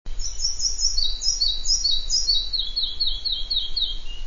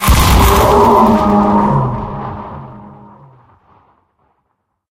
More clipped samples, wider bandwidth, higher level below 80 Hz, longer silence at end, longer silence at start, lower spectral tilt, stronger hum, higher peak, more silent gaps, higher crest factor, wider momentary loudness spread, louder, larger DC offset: neither; second, 7.4 kHz vs 17.5 kHz; second, -30 dBFS vs -20 dBFS; second, 0 s vs 2 s; about the same, 0.05 s vs 0 s; second, 1 dB/octave vs -5.5 dB/octave; neither; second, -6 dBFS vs 0 dBFS; neither; about the same, 16 dB vs 12 dB; second, 6 LU vs 20 LU; second, -22 LUFS vs -10 LUFS; first, 2% vs under 0.1%